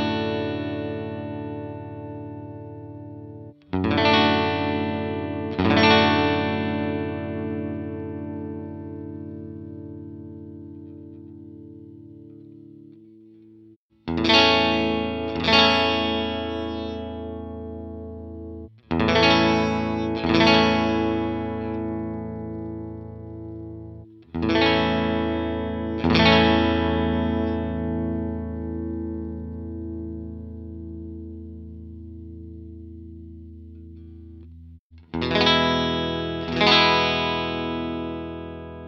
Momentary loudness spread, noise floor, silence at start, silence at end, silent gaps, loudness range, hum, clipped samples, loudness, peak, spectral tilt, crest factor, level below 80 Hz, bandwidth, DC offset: 23 LU; -53 dBFS; 0 s; 0 s; 13.76-13.89 s, 34.79-34.90 s; 19 LU; none; under 0.1%; -22 LUFS; -2 dBFS; -6 dB/octave; 22 dB; -42 dBFS; 7.4 kHz; under 0.1%